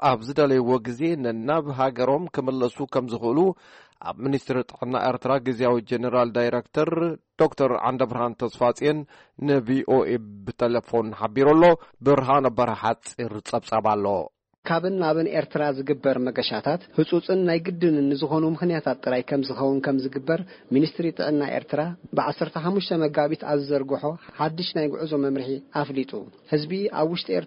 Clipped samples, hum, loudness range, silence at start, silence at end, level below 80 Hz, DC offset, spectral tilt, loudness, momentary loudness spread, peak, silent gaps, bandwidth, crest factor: under 0.1%; none; 4 LU; 0 s; 0 s; -60 dBFS; under 0.1%; -7 dB/octave; -24 LUFS; 7 LU; -8 dBFS; 14.58-14.63 s; 8.4 kHz; 16 dB